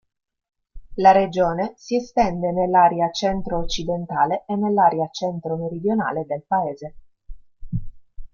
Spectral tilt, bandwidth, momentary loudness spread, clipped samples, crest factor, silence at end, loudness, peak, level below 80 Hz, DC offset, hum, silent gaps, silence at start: -6 dB/octave; 7.2 kHz; 14 LU; under 0.1%; 18 dB; 0.1 s; -21 LUFS; -2 dBFS; -40 dBFS; under 0.1%; none; none; 0.75 s